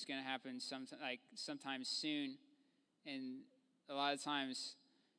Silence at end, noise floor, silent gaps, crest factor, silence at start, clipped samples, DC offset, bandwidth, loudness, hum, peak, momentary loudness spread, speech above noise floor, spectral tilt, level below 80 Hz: 0.45 s; -78 dBFS; none; 22 dB; 0 s; under 0.1%; under 0.1%; 11 kHz; -45 LUFS; none; -24 dBFS; 11 LU; 33 dB; -2.5 dB/octave; under -90 dBFS